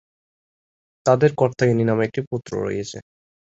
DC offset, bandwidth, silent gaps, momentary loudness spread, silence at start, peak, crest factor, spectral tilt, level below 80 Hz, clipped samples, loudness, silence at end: under 0.1%; 8 kHz; 2.27-2.31 s; 12 LU; 1.05 s; -2 dBFS; 20 dB; -7 dB/octave; -56 dBFS; under 0.1%; -21 LUFS; 0.45 s